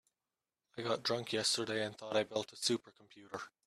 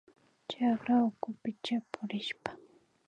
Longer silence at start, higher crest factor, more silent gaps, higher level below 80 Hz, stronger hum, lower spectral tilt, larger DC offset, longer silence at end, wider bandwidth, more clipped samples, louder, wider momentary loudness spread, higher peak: first, 0.75 s vs 0.5 s; about the same, 18 dB vs 18 dB; neither; about the same, -80 dBFS vs -78 dBFS; neither; second, -3 dB/octave vs -6 dB/octave; neither; second, 0.2 s vs 0.5 s; first, 14.5 kHz vs 8.8 kHz; neither; about the same, -36 LUFS vs -34 LUFS; about the same, 14 LU vs 15 LU; second, -20 dBFS vs -16 dBFS